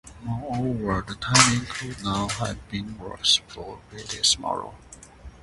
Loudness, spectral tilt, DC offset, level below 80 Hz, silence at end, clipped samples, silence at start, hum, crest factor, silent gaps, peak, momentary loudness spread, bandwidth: -24 LUFS; -2.5 dB/octave; under 0.1%; -46 dBFS; 0.05 s; under 0.1%; 0.05 s; none; 26 dB; none; 0 dBFS; 19 LU; 11.5 kHz